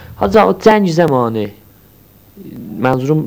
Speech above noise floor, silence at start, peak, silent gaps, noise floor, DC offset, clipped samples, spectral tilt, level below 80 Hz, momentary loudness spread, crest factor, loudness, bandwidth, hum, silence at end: 33 dB; 0 s; 0 dBFS; none; -45 dBFS; under 0.1%; 0.2%; -7 dB/octave; -42 dBFS; 19 LU; 14 dB; -13 LUFS; over 20 kHz; none; 0 s